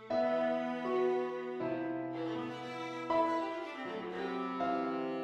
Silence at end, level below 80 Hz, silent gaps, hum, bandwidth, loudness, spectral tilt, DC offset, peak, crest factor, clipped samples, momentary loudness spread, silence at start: 0 s; -76 dBFS; none; none; 8.8 kHz; -36 LUFS; -6.5 dB/octave; under 0.1%; -22 dBFS; 14 dB; under 0.1%; 9 LU; 0 s